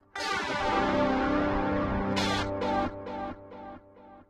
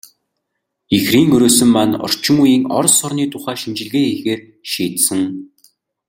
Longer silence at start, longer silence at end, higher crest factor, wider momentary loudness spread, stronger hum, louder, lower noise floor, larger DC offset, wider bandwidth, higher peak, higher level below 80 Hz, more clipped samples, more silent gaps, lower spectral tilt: second, 0.15 s vs 0.9 s; second, 0.05 s vs 0.65 s; about the same, 16 dB vs 16 dB; about the same, 15 LU vs 13 LU; neither; second, -29 LUFS vs -14 LUFS; second, -53 dBFS vs -75 dBFS; neither; second, 13.5 kHz vs 17 kHz; second, -14 dBFS vs 0 dBFS; first, -44 dBFS vs -52 dBFS; neither; neither; first, -5 dB/octave vs -3.5 dB/octave